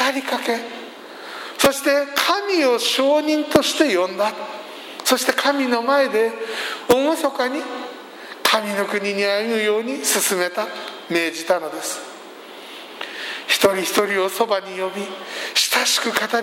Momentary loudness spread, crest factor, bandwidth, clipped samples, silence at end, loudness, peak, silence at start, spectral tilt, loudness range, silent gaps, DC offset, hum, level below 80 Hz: 16 LU; 20 dB; 16.5 kHz; under 0.1%; 0 s; -19 LUFS; 0 dBFS; 0 s; -2 dB/octave; 4 LU; none; under 0.1%; none; -60 dBFS